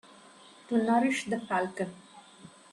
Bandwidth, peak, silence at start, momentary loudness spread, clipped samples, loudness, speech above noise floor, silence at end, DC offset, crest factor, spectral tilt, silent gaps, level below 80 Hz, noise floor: 12 kHz; -14 dBFS; 0.7 s; 17 LU; under 0.1%; -30 LUFS; 26 dB; 0.25 s; under 0.1%; 18 dB; -5 dB/octave; none; -74 dBFS; -54 dBFS